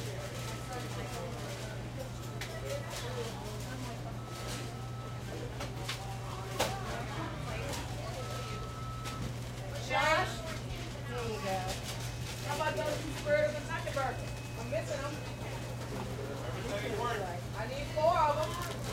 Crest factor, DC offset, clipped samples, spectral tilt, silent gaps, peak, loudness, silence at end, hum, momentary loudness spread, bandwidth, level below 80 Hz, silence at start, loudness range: 20 dB; under 0.1%; under 0.1%; -4.5 dB/octave; none; -16 dBFS; -37 LUFS; 0 s; none; 10 LU; 16 kHz; -50 dBFS; 0 s; 5 LU